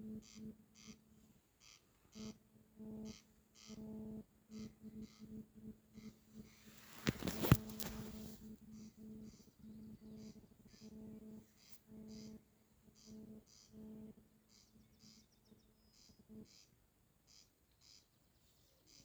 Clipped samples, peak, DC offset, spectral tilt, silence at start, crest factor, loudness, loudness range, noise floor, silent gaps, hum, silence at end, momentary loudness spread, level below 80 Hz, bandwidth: under 0.1%; -14 dBFS; under 0.1%; -5.5 dB/octave; 0 s; 36 dB; -48 LUFS; 22 LU; -75 dBFS; none; none; 0 s; 22 LU; -64 dBFS; over 20 kHz